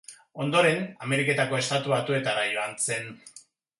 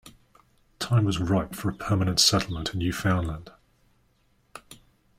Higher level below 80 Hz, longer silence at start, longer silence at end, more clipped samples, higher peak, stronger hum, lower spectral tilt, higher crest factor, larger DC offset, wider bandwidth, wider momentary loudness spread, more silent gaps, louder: second, -72 dBFS vs -48 dBFS; about the same, 0.1 s vs 0.05 s; about the same, 0.4 s vs 0.45 s; neither; about the same, -10 dBFS vs -8 dBFS; neither; about the same, -4 dB/octave vs -4.5 dB/octave; about the same, 18 dB vs 20 dB; neither; second, 11.5 kHz vs 16 kHz; second, 11 LU vs 16 LU; neither; about the same, -26 LUFS vs -25 LUFS